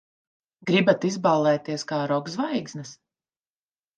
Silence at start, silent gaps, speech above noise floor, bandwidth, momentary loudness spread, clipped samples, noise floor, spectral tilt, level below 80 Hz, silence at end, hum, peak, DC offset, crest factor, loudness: 0.65 s; none; over 66 dB; 9.2 kHz; 16 LU; under 0.1%; under -90 dBFS; -5.5 dB/octave; -74 dBFS; 1.05 s; none; -6 dBFS; under 0.1%; 20 dB; -24 LUFS